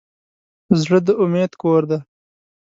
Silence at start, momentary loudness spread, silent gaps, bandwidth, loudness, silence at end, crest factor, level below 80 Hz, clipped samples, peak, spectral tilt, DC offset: 0.7 s; 6 LU; none; 7.8 kHz; -18 LUFS; 0.7 s; 18 dB; -60 dBFS; under 0.1%; 0 dBFS; -7.5 dB/octave; under 0.1%